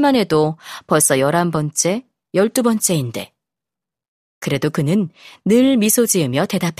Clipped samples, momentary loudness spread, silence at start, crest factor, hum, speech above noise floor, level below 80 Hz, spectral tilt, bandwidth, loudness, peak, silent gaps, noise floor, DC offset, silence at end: under 0.1%; 13 LU; 0 s; 18 dB; none; 70 dB; -56 dBFS; -4.5 dB/octave; 15.5 kHz; -17 LUFS; 0 dBFS; 4.08-4.41 s; -87 dBFS; under 0.1%; 0.05 s